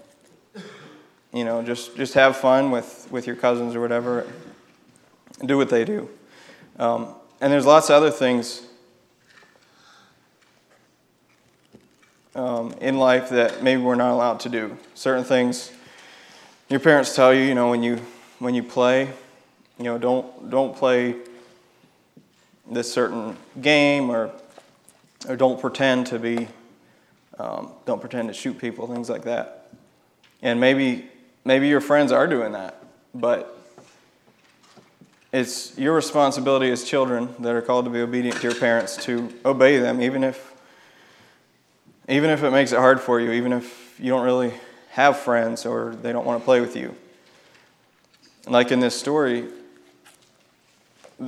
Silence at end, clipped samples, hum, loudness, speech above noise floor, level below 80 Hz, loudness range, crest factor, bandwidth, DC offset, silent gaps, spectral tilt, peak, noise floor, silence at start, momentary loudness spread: 0 s; under 0.1%; none; -21 LUFS; 41 dB; -74 dBFS; 6 LU; 22 dB; 14 kHz; under 0.1%; none; -4.5 dB/octave; 0 dBFS; -61 dBFS; 0.55 s; 15 LU